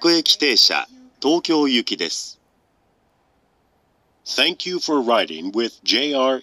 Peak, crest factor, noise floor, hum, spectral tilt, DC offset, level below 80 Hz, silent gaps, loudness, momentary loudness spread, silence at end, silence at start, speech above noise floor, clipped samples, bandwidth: -2 dBFS; 18 dB; -63 dBFS; none; -2 dB/octave; under 0.1%; -72 dBFS; none; -18 LUFS; 11 LU; 0 s; 0 s; 44 dB; under 0.1%; 15.5 kHz